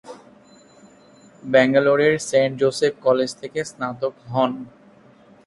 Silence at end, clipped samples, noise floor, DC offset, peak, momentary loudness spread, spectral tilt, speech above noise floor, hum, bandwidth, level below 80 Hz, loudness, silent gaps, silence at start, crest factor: 0.8 s; under 0.1%; -50 dBFS; under 0.1%; -2 dBFS; 12 LU; -5 dB/octave; 31 dB; none; 11.5 kHz; -62 dBFS; -20 LUFS; none; 0.05 s; 20 dB